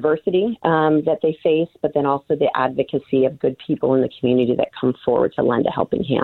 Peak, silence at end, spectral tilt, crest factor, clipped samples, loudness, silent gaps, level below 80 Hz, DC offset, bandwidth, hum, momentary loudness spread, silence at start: -2 dBFS; 0 s; -9.5 dB/octave; 16 dB; under 0.1%; -19 LUFS; none; -56 dBFS; under 0.1%; 4.3 kHz; none; 4 LU; 0 s